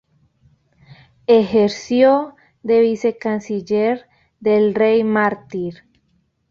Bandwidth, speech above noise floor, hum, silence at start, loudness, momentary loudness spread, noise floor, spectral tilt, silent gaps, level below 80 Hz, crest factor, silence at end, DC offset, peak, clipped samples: 7.4 kHz; 48 dB; none; 1.3 s; -17 LUFS; 13 LU; -64 dBFS; -6.5 dB/octave; none; -60 dBFS; 16 dB; 0.75 s; under 0.1%; -2 dBFS; under 0.1%